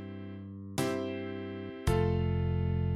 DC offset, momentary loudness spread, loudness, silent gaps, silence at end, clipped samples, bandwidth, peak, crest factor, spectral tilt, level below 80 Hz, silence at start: under 0.1%; 14 LU; -33 LUFS; none; 0 s; under 0.1%; 14.5 kHz; -16 dBFS; 16 dB; -7 dB/octave; -44 dBFS; 0 s